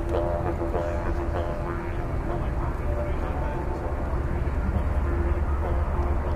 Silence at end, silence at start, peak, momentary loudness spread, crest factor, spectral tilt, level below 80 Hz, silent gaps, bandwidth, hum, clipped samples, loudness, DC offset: 0 s; 0 s; -12 dBFS; 4 LU; 14 dB; -8.5 dB/octave; -28 dBFS; none; 9.2 kHz; none; under 0.1%; -28 LUFS; under 0.1%